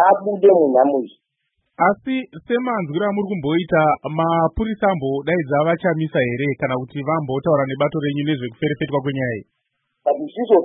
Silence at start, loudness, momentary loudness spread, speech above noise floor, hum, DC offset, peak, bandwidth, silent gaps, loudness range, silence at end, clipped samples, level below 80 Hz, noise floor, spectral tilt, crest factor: 0 s; -19 LUFS; 8 LU; 54 dB; none; under 0.1%; -2 dBFS; 4 kHz; none; 3 LU; 0 s; under 0.1%; -48 dBFS; -72 dBFS; -12 dB/octave; 16 dB